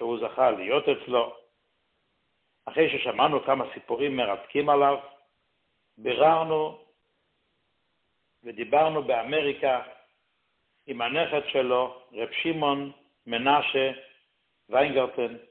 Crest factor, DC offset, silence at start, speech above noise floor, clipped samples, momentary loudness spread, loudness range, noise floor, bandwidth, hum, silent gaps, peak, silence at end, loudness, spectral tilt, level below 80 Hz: 20 dB; under 0.1%; 0 s; 50 dB; under 0.1%; 11 LU; 3 LU; -75 dBFS; 4.4 kHz; none; none; -8 dBFS; 0.1 s; -26 LUFS; -9 dB/octave; -68 dBFS